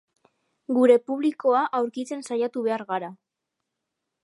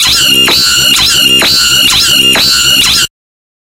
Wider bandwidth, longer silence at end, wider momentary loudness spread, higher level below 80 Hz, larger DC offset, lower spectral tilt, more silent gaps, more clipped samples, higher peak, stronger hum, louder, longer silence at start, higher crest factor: second, 11.5 kHz vs over 20 kHz; first, 1.1 s vs 0.65 s; first, 13 LU vs 1 LU; second, -84 dBFS vs -32 dBFS; neither; first, -5.5 dB/octave vs 0 dB/octave; neither; second, under 0.1% vs 0.7%; second, -6 dBFS vs 0 dBFS; neither; second, -24 LUFS vs -4 LUFS; first, 0.7 s vs 0 s; first, 20 dB vs 8 dB